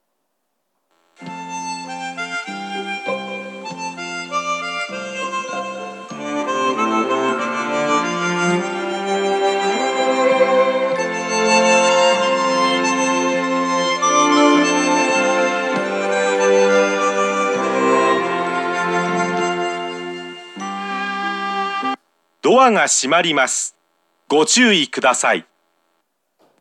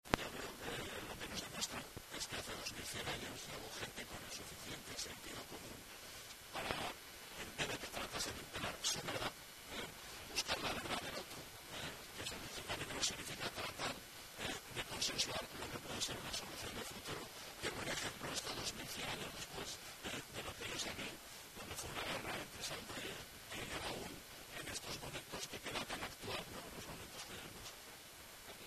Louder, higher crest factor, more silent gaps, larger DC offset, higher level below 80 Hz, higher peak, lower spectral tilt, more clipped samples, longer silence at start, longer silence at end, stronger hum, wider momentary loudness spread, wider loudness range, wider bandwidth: first, -17 LUFS vs -45 LUFS; second, 16 dB vs 38 dB; neither; neither; second, -88 dBFS vs -64 dBFS; first, -2 dBFS vs -8 dBFS; about the same, -3 dB/octave vs -2 dB/octave; neither; first, 1.2 s vs 0.05 s; first, 1.2 s vs 0 s; neither; first, 14 LU vs 10 LU; first, 9 LU vs 4 LU; second, 12 kHz vs 14 kHz